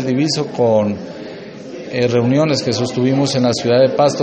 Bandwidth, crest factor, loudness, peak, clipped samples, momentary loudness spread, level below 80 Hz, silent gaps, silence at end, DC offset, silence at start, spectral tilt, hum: 8.8 kHz; 14 dB; -15 LUFS; -2 dBFS; under 0.1%; 17 LU; -56 dBFS; none; 0 s; under 0.1%; 0 s; -5.5 dB/octave; none